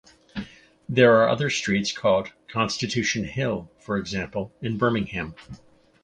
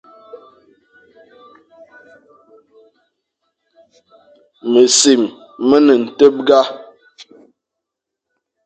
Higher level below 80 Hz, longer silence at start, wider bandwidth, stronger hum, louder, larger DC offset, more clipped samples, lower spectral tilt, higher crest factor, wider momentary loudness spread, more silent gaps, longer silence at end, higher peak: first, -52 dBFS vs -64 dBFS; about the same, 0.35 s vs 0.35 s; about the same, 9.8 kHz vs 9.4 kHz; neither; second, -24 LUFS vs -12 LUFS; neither; neither; first, -5 dB/octave vs -2.5 dB/octave; about the same, 20 dB vs 18 dB; first, 19 LU vs 13 LU; neither; second, 0.5 s vs 1.85 s; second, -4 dBFS vs 0 dBFS